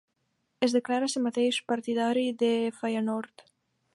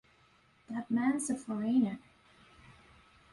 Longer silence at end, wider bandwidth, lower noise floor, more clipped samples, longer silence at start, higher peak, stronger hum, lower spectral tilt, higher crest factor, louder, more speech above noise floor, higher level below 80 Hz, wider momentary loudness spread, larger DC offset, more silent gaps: about the same, 0.7 s vs 0.6 s; about the same, 11.5 kHz vs 11.5 kHz; first, -77 dBFS vs -66 dBFS; neither; about the same, 0.6 s vs 0.7 s; first, -10 dBFS vs -18 dBFS; neither; about the same, -4 dB/octave vs -5 dB/octave; about the same, 18 dB vs 16 dB; first, -28 LUFS vs -33 LUFS; first, 49 dB vs 34 dB; second, -82 dBFS vs -70 dBFS; second, 4 LU vs 12 LU; neither; neither